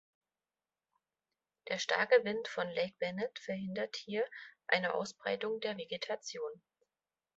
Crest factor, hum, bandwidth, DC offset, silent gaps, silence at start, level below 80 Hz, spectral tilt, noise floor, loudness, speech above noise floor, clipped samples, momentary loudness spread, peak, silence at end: 24 dB; none; 8 kHz; under 0.1%; none; 1.65 s; -82 dBFS; -2 dB/octave; under -90 dBFS; -36 LUFS; over 54 dB; under 0.1%; 11 LU; -14 dBFS; 0.8 s